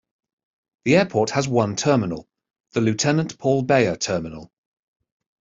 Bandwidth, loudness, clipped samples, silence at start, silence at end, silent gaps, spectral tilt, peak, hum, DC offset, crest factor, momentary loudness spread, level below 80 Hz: 8 kHz; -21 LUFS; under 0.1%; 0.85 s; 0.95 s; 2.60-2.64 s; -5 dB/octave; -4 dBFS; none; under 0.1%; 20 dB; 11 LU; -56 dBFS